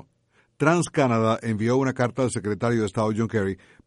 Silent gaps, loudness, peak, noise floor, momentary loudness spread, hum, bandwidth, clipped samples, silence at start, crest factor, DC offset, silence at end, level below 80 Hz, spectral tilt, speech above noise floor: none; -24 LUFS; -6 dBFS; -65 dBFS; 5 LU; none; 11.5 kHz; under 0.1%; 0.6 s; 18 dB; under 0.1%; 0.3 s; -58 dBFS; -6.5 dB/octave; 42 dB